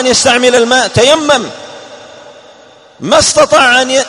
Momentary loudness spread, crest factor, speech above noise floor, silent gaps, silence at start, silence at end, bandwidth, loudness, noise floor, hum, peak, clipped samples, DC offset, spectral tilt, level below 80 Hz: 17 LU; 10 dB; 31 dB; none; 0 s; 0 s; 13 kHz; -8 LUFS; -39 dBFS; none; 0 dBFS; 0.7%; under 0.1%; -2 dB/octave; -42 dBFS